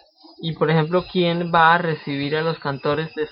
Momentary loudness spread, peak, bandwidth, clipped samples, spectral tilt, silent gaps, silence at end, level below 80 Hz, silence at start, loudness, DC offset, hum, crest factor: 9 LU; -2 dBFS; 5.6 kHz; under 0.1%; -10 dB/octave; none; 0 s; -54 dBFS; 0.4 s; -20 LUFS; under 0.1%; none; 18 dB